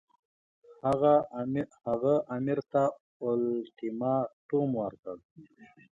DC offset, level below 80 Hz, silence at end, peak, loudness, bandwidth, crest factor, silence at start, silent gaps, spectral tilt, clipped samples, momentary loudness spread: under 0.1%; -68 dBFS; 0.3 s; -14 dBFS; -30 LUFS; 10.5 kHz; 18 dB; 0.7 s; 3.00-3.20 s, 4.33-4.49 s, 4.99-5.03 s, 5.25-5.36 s; -9 dB/octave; under 0.1%; 12 LU